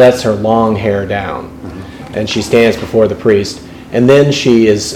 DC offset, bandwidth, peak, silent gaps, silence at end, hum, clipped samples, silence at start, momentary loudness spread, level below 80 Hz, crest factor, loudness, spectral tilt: under 0.1%; 16 kHz; 0 dBFS; none; 0 s; none; 0.8%; 0 s; 17 LU; -38 dBFS; 12 dB; -11 LUFS; -5.5 dB/octave